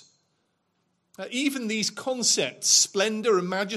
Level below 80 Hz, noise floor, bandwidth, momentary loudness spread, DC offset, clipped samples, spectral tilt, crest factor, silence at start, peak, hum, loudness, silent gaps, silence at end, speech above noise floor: -78 dBFS; -73 dBFS; 15.5 kHz; 9 LU; under 0.1%; under 0.1%; -1.5 dB/octave; 20 dB; 1.2 s; -6 dBFS; none; -23 LUFS; none; 0 s; 48 dB